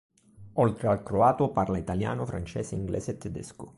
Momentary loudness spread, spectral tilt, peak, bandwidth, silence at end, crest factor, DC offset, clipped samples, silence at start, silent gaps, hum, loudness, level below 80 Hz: 12 LU; -7.5 dB/octave; -10 dBFS; 11.5 kHz; 0.1 s; 18 dB; under 0.1%; under 0.1%; 0.4 s; none; none; -28 LUFS; -48 dBFS